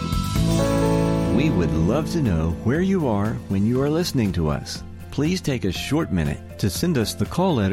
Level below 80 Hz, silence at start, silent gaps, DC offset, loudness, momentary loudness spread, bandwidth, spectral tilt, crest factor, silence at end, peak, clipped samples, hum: -34 dBFS; 0 s; none; under 0.1%; -22 LUFS; 5 LU; 16 kHz; -6.5 dB/octave; 14 dB; 0 s; -6 dBFS; under 0.1%; none